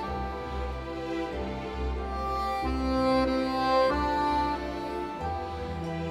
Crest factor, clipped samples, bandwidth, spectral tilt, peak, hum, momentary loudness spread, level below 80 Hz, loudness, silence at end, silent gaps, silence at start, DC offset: 14 dB; under 0.1%; 15 kHz; -6.5 dB/octave; -14 dBFS; none; 10 LU; -38 dBFS; -30 LUFS; 0 s; none; 0 s; under 0.1%